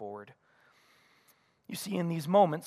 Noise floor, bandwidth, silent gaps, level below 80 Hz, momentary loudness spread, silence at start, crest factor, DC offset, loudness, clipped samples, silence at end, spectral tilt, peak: -68 dBFS; 15.5 kHz; none; -82 dBFS; 18 LU; 0 s; 22 dB; under 0.1%; -31 LUFS; under 0.1%; 0 s; -6 dB/octave; -12 dBFS